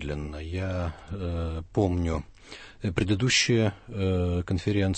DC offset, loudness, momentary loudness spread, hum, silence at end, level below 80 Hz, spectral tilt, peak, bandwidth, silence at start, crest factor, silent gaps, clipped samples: under 0.1%; -28 LUFS; 13 LU; none; 0 s; -42 dBFS; -5 dB/octave; -10 dBFS; 8.8 kHz; 0 s; 18 dB; none; under 0.1%